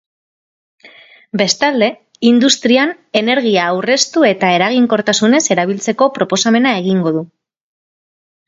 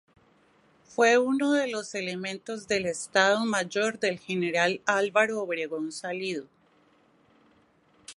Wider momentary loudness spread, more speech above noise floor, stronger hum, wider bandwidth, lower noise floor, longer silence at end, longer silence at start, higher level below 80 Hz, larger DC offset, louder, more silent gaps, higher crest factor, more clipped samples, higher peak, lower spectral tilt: second, 6 LU vs 11 LU; second, 29 dB vs 36 dB; neither; second, 7.8 kHz vs 11.5 kHz; second, -42 dBFS vs -63 dBFS; first, 1.25 s vs 0.05 s; about the same, 0.85 s vs 0.9 s; first, -62 dBFS vs -72 dBFS; neither; first, -13 LUFS vs -27 LUFS; neither; second, 14 dB vs 22 dB; neither; first, 0 dBFS vs -6 dBFS; about the same, -3.5 dB/octave vs -3.5 dB/octave